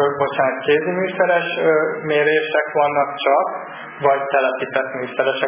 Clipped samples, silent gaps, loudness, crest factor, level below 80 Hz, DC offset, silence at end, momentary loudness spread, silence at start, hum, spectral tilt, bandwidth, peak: under 0.1%; none; -18 LUFS; 16 dB; -68 dBFS; under 0.1%; 0 s; 5 LU; 0 s; none; -8.5 dB/octave; 3.6 kHz; -2 dBFS